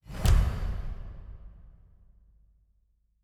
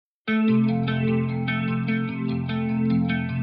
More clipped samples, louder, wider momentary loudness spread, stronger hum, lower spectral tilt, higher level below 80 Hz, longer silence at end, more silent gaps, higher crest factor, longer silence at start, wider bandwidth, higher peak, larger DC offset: neither; second, -30 LUFS vs -24 LUFS; first, 25 LU vs 6 LU; neither; second, -5.5 dB/octave vs -11 dB/octave; first, -32 dBFS vs -54 dBFS; first, 1.5 s vs 0 s; neither; first, 20 dB vs 12 dB; second, 0.05 s vs 0.25 s; first, 17.5 kHz vs 5.2 kHz; about the same, -10 dBFS vs -10 dBFS; neither